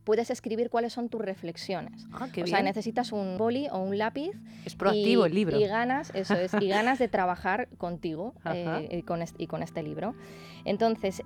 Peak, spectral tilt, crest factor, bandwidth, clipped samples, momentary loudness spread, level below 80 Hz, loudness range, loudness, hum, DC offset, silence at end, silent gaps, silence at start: -10 dBFS; -6 dB/octave; 18 dB; 14.5 kHz; under 0.1%; 11 LU; -62 dBFS; 6 LU; -29 LUFS; none; under 0.1%; 0 s; none; 0.05 s